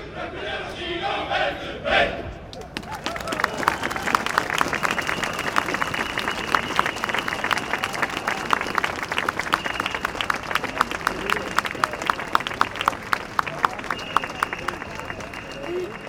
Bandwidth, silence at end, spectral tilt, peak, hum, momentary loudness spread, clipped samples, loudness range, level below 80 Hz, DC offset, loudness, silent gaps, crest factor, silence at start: over 20 kHz; 0 s; -3 dB/octave; 0 dBFS; none; 8 LU; under 0.1%; 2 LU; -46 dBFS; under 0.1%; -24 LUFS; none; 26 dB; 0 s